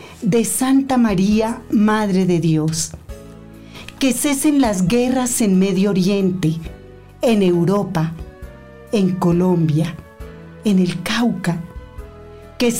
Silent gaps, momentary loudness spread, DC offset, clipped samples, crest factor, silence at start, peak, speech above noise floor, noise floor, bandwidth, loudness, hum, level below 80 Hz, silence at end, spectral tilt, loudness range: none; 21 LU; 0.4%; under 0.1%; 10 dB; 0 s; -8 dBFS; 22 dB; -38 dBFS; 16 kHz; -17 LUFS; none; -42 dBFS; 0 s; -5.5 dB/octave; 3 LU